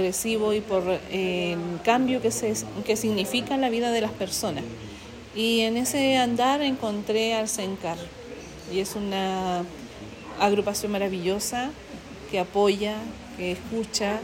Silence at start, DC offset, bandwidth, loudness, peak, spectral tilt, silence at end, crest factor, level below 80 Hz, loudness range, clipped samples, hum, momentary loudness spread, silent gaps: 0 s; under 0.1%; 16.5 kHz; -26 LUFS; -8 dBFS; -3.5 dB/octave; 0 s; 18 dB; -54 dBFS; 4 LU; under 0.1%; none; 15 LU; none